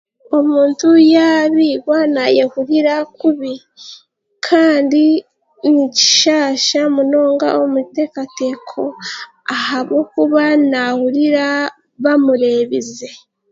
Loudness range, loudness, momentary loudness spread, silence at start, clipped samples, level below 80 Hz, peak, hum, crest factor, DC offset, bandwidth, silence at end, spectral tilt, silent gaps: 5 LU; -14 LUFS; 13 LU; 0.3 s; under 0.1%; -66 dBFS; 0 dBFS; none; 14 dB; under 0.1%; 7.8 kHz; 0.35 s; -2.5 dB/octave; none